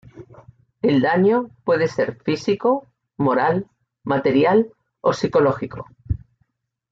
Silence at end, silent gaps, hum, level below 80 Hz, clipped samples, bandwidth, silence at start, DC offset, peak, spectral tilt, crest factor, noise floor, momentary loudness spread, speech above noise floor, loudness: 0.75 s; none; none; -46 dBFS; under 0.1%; 7.8 kHz; 0.15 s; under 0.1%; -6 dBFS; -7 dB/octave; 16 dB; -68 dBFS; 13 LU; 49 dB; -20 LUFS